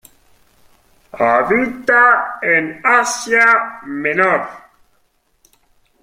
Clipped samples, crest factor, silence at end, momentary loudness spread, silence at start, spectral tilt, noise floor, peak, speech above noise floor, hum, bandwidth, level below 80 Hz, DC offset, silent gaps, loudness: under 0.1%; 16 dB; 1.45 s; 9 LU; 1.15 s; -3.5 dB/octave; -61 dBFS; 0 dBFS; 46 dB; none; 16 kHz; -56 dBFS; under 0.1%; none; -14 LUFS